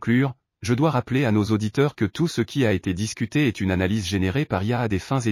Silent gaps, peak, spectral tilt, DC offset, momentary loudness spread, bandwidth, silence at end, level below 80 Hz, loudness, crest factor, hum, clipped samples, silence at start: none; -6 dBFS; -6.5 dB/octave; under 0.1%; 4 LU; 15 kHz; 0 s; -50 dBFS; -23 LUFS; 16 dB; none; under 0.1%; 0 s